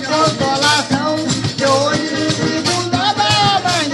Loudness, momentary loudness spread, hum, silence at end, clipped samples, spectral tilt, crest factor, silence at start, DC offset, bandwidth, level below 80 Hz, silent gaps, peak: -15 LUFS; 5 LU; none; 0 s; under 0.1%; -3.5 dB/octave; 14 dB; 0 s; under 0.1%; 12.5 kHz; -46 dBFS; none; 0 dBFS